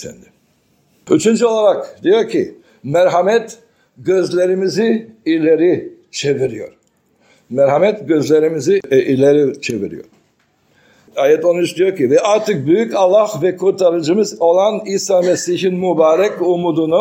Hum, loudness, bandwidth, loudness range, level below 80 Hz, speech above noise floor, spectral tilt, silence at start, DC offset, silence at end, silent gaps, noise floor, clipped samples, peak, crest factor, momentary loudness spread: none; -14 LUFS; 16 kHz; 3 LU; -62 dBFS; 45 dB; -5.5 dB/octave; 0 s; under 0.1%; 0 s; none; -59 dBFS; under 0.1%; 0 dBFS; 14 dB; 9 LU